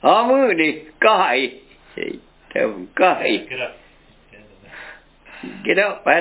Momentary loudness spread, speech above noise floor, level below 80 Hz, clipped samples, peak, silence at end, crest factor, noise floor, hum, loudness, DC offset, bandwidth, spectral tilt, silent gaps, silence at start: 23 LU; 33 dB; -58 dBFS; under 0.1%; 0 dBFS; 0 s; 20 dB; -51 dBFS; none; -18 LUFS; under 0.1%; 4 kHz; -7.5 dB/octave; none; 0.05 s